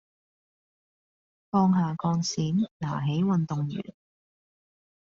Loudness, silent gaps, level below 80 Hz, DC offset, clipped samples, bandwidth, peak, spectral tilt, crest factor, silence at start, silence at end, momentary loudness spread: -27 LUFS; 2.71-2.80 s; -66 dBFS; under 0.1%; under 0.1%; 7.4 kHz; -12 dBFS; -7.5 dB/octave; 18 dB; 1.55 s; 1.15 s; 9 LU